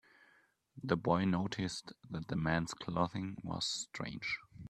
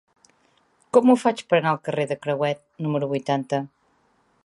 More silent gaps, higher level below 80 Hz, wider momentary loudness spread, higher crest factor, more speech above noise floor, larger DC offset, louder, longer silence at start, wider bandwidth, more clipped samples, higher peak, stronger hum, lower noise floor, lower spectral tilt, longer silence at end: neither; first, -64 dBFS vs -74 dBFS; about the same, 11 LU vs 10 LU; about the same, 24 dB vs 22 dB; second, 34 dB vs 42 dB; neither; second, -37 LUFS vs -23 LUFS; second, 0.75 s vs 0.95 s; about the same, 12 kHz vs 11.5 kHz; neither; second, -14 dBFS vs -2 dBFS; neither; first, -70 dBFS vs -64 dBFS; second, -5 dB/octave vs -6.5 dB/octave; second, 0 s vs 0.8 s